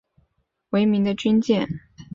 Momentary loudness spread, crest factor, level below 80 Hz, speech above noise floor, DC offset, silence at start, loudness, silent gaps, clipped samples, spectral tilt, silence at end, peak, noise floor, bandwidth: 10 LU; 16 dB; -56 dBFS; 50 dB; under 0.1%; 0.7 s; -21 LUFS; none; under 0.1%; -7 dB/octave; 0.1 s; -8 dBFS; -70 dBFS; 7.4 kHz